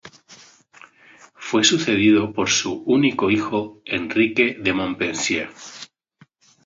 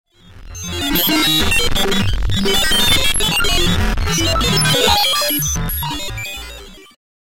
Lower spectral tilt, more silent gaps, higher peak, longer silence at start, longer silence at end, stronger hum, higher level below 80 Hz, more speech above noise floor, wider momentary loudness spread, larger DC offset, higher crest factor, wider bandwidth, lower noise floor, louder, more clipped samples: about the same, -3.5 dB/octave vs -2.5 dB/octave; neither; about the same, -2 dBFS vs -2 dBFS; about the same, 0.05 s vs 0.05 s; first, 0.8 s vs 0.25 s; neither; second, -54 dBFS vs -24 dBFS; first, 36 dB vs 22 dB; first, 18 LU vs 13 LU; second, under 0.1% vs 3%; first, 20 dB vs 14 dB; second, 7.8 kHz vs 17 kHz; first, -56 dBFS vs -37 dBFS; second, -19 LUFS vs -15 LUFS; neither